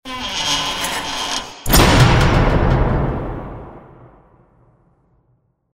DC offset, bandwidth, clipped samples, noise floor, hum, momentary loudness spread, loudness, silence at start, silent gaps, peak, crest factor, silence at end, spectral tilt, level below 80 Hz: under 0.1%; 16 kHz; under 0.1%; -62 dBFS; none; 15 LU; -16 LUFS; 0.05 s; none; 0 dBFS; 18 dB; 1.95 s; -4.5 dB/octave; -24 dBFS